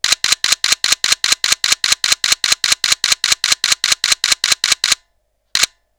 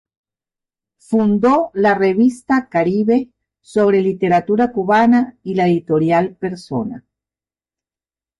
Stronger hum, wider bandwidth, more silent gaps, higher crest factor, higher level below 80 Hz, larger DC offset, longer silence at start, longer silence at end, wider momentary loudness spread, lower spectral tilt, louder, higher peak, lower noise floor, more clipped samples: neither; first, over 20 kHz vs 11.5 kHz; neither; about the same, 16 dB vs 12 dB; first, -50 dBFS vs -56 dBFS; neither; second, 0.05 s vs 1.1 s; second, 0.35 s vs 1.4 s; second, 2 LU vs 10 LU; second, 2.5 dB/octave vs -7.5 dB/octave; first, -13 LUFS vs -16 LUFS; first, 0 dBFS vs -4 dBFS; second, -64 dBFS vs under -90 dBFS; neither